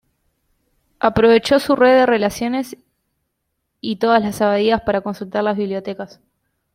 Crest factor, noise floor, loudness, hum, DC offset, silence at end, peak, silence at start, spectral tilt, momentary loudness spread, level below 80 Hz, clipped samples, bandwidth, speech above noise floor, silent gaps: 18 dB; -74 dBFS; -17 LUFS; none; under 0.1%; 0.7 s; -2 dBFS; 1.05 s; -5.5 dB/octave; 15 LU; -50 dBFS; under 0.1%; 16 kHz; 57 dB; none